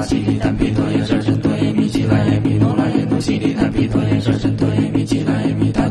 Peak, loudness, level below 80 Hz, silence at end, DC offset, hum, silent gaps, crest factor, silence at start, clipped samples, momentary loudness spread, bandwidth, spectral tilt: -2 dBFS; -17 LUFS; -34 dBFS; 0 s; under 0.1%; none; none; 14 dB; 0 s; under 0.1%; 2 LU; 11 kHz; -7.5 dB/octave